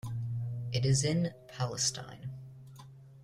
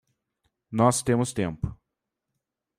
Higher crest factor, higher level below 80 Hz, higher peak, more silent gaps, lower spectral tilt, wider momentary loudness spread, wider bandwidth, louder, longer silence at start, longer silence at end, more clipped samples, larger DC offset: about the same, 16 dB vs 20 dB; second, -60 dBFS vs -50 dBFS; second, -18 dBFS vs -8 dBFS; neither; about the same, -4.5 dB/octave vs -5.5 dB/octave; first, 23 LU vs 13 LU; second, 14 kHz vs 15.5 kHz; second, -33 LUFS vs -26 LUFS; second, 0.05 s vs 0.7 s; second, 0 s vs 1.05 s; neither; neither